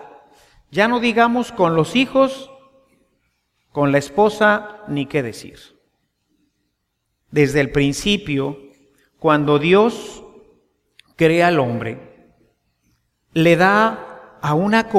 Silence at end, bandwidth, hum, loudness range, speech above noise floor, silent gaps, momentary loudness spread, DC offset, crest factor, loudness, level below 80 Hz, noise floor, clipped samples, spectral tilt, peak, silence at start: 0 s; 15 kHz; none; 4 LU; 56 dB; none; 16 LU; under 0.1%; 18 dB; -17 LUFS; -48 dBFS; -73 dBFS; under 0.1%; -5.5 dB/octave; -2 dBFS; 0 s